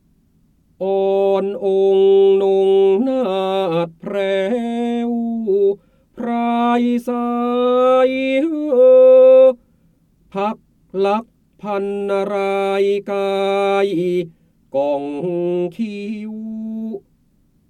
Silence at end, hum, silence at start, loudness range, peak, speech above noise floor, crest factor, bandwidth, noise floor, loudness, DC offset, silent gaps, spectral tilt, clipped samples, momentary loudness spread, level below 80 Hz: 0.7 s; none; 0.8 s; 8 LU; -4 dBFS; 41 dB; 14 dB; 9.4 kHz; -58 dBFS; -16 LUFS; under 0.1%; none; -7 dB/octave; under 0.1%; 15 LU; -60 dBFS